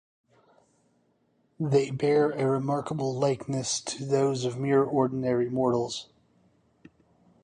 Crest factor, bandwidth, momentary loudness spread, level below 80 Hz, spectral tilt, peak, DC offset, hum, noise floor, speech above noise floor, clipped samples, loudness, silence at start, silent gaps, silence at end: 18 dB; 10.5 kHz; 6 LU; -66 dBFS; -5.5 dB/octave; -10 dBFS; under 0.1%; none; -69 dBFS; 43 dB; under 0.1%; -27 LUFS; 1.6 s; none; 1.4 s